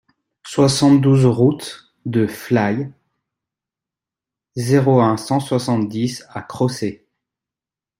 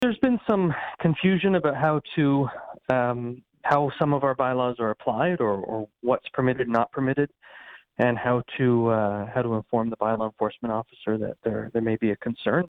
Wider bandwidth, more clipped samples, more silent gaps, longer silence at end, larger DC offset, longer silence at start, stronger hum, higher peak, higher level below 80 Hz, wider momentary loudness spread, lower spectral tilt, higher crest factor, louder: first, 16 kHz vs 6.4 kHz; neither; neither; first, 1.05 s vs 0.05 s; neither; first, 0.45 s vs 0 s; neither; first, -2 dBFS vs -8 dBFS; about the same, -56 dBFS vs -58 dBFS; first, 17 LU vs 8 LU; second, -6.5 dB/octave vs -9 dB/octave; about the same, 16 dB vs 16 dB; first, -17 LUFS vs -25 LUFS